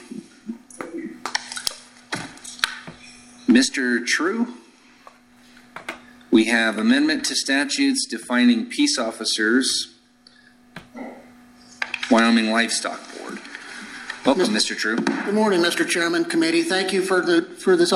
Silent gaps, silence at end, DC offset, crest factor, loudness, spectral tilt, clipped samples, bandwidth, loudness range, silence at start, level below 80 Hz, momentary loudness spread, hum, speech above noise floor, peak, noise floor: none; 0 s; under 0.1%; 22 dB; -20 LUFS; -3 dB/octave; under 0.1%; 16 kHz; 4 LU; 0 s; -64 dBFS; 19 LU; none; 33 dB; 0 dBFS; -53 dBFS